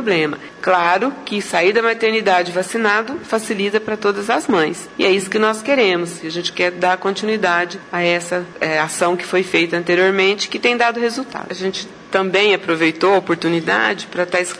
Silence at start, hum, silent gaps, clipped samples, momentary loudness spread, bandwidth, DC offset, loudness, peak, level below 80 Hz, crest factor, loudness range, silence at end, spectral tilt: 0 s; none; none; under 0.1%; 8 LU; 11 kHz; under 0.1%; -17 LUFS; 0 dBFS; -62 dBFS; 16 dB; 1 LU; 0 s; -4 dB/octave